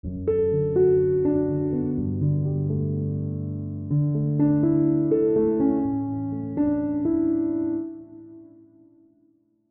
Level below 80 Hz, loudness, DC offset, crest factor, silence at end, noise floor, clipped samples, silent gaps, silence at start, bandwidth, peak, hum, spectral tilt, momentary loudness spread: -50 dBFS; -24 LUFS; under 0.1%; 14 dB; 1.25 s; -63 dBFS; under 0.1%; none; 0.05 s; 2.8 kHz; -10 dBFS; none; -14 dB/octave; 9 LU